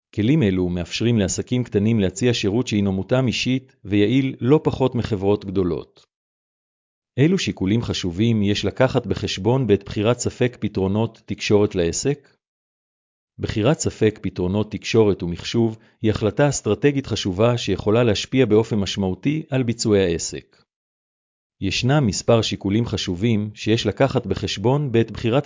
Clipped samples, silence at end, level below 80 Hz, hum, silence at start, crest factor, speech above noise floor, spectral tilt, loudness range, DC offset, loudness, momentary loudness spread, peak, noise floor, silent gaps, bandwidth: under 0.1%; 0 s; -42 dBFS; none; 0.15 s; 16 dB; over 70 dB; -6 dB/octave; 3 LU; under 0.1%; -21 LUFS; 6 LU; -4 dBFS; under -90 dBFS; 6.16-7.02 s, 12.48-13.28 s, 20.76-21.50 s; 7.6 kHz